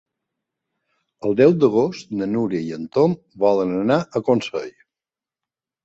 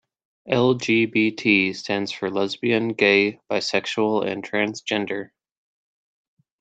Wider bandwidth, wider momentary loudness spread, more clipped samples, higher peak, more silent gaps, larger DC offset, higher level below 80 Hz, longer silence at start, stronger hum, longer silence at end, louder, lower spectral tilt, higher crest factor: about the same, 8 kHz vs 8.8 kHz; first, 11 LU vs 8 LU; neither; about the same, -2 dBFS vs -4 dBFS; neither; neither; first, -60 dBFS vs -66 dBFS; first, 1.25 s vs 0.45 s; neither; second, 1.15 s vs 1.35 s; about the same, -20 LUFS vs -21 LUFS; first, -7.5 dB/octave vs -5 dB/octave; about the same, 18 dB vs 20 dB